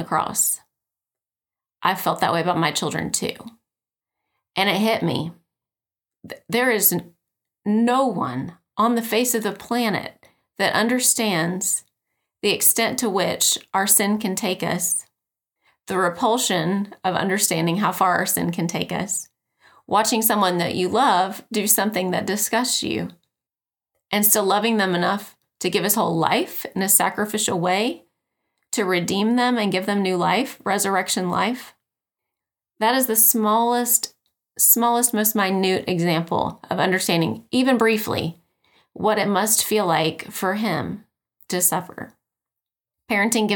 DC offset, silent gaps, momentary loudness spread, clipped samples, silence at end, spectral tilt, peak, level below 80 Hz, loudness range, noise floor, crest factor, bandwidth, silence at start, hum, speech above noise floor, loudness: under 0.1%; none; 10 LU; under 0.1%; 0 s; -3 dB/octave; -2 dBFS; -64 dBFS; 4 LU; under -90 dBFS; 20 dB; 19.5 kHz; 0 s; none; over 69 dB; -20 LUFS